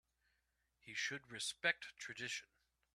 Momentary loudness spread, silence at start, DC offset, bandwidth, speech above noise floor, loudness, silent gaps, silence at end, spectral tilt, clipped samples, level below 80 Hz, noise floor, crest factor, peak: 10 LU; 0.85 s; under 0.1%; 13.5 kHz; 40 dB; -43 LUFS; none; 0.5 s; -1 dB/octave; under 0.1%; -84 dBFS; -84 dBFS; 26 dB; -22 dBFS